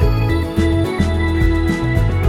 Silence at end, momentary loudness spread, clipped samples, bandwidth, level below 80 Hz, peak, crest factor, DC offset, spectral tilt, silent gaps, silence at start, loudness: 0 s; 1 LU; under 0.1%; 14.5 kHz; -20 dBFS; -2 dBFS; 12 dB; under 0.1%; -7.5 dB/octave; none; 0 s; -17 LUFS